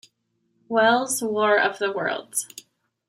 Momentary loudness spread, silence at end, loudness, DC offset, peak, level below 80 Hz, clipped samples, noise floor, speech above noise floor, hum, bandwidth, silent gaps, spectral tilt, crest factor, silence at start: 9 LU; 0.5 s; -22 LUFS; under 0.1%; -6 dBFS; -78 dBFS; under 0.1%; -71 dBFS; 49 dB; none; 16 kHz; none; -2 dB/octave; 18 dB; 0.7 s